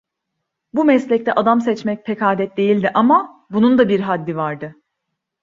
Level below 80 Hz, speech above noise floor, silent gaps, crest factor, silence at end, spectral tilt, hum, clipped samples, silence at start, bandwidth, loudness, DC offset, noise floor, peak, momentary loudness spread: -60 dBFS; 61 dB; none; 16 dB; 0.7 s; -7.5 dB/octave; none; under 0.1%; 0.75 s; 7.6 kHz; -17 LUFS; under 0.1%; -77 dBFS; -2 dBFS; 10 LU